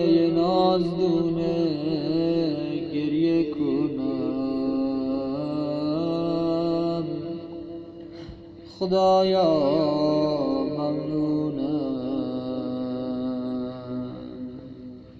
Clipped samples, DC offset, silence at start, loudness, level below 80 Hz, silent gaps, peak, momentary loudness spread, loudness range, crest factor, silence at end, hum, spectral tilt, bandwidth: under 0.1%; under 0.1%; 0 s; -25 LUFS; -54 dBFS; none; -10 dBFS; 16 LU; 5 LU; 16 dB; 0 s; none; -8.5 dB/octave; 7.2 kHz